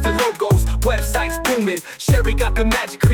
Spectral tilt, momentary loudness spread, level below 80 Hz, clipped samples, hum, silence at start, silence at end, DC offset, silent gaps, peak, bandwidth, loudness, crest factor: -5 dB/octave; 3 LU; -22 dBFS; under 0.1%; none; 0 s; 0 s; under 0.1%; none; -4 dBFS; 19 kHz; -19 LUFS; 12 dB